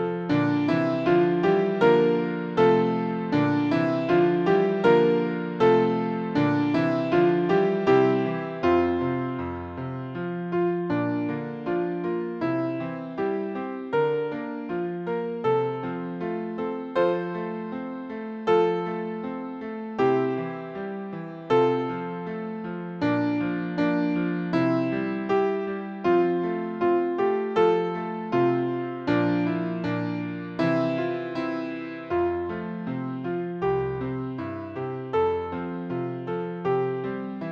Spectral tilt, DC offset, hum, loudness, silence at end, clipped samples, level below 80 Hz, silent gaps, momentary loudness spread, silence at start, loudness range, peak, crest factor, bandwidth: -8.5 dB/octave; under 0.1%; none; -25 LUFS; 0 s; under 0.1%; -60 dBFS; none; 12 LU; 0 s; 7 LU; -6 dBFS; 18 dB; 6.8 kHz